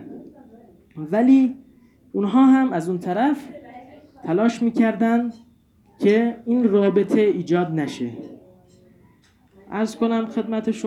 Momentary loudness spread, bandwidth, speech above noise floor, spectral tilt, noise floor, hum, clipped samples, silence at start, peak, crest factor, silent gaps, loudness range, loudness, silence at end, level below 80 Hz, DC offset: 20 LU; 11 kHz; 37 dB; -7.5 dB/octave; -56 dBFS; none; under 0.1%; 0 s; -6 dBFS; 16 dB; none; 5 LU; -20 LUFS; 0 s; -66 dBFS; under 0.1%